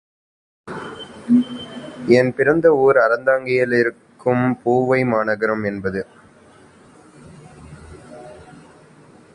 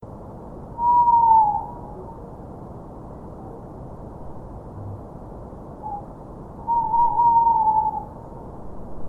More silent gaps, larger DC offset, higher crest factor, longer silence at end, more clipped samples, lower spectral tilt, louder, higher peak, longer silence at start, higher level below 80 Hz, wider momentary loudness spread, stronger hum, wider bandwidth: neither; neither; about the same, 20 dB vs 18 dB; first, 0.9 s vs 0 s; neither; second, -7.5 dB/octave vs -10 dB/octave; about the same, -18 LUFS vs -19 LUFS; first, 0 dBFS vs -6 dBFS; first, 0.65 s vs 0 s; second, -54 dBFS vs -44 dBFS; second, 20 LU vs 23 LU; neither; first, 10.5 kHz vs 1.9 kHz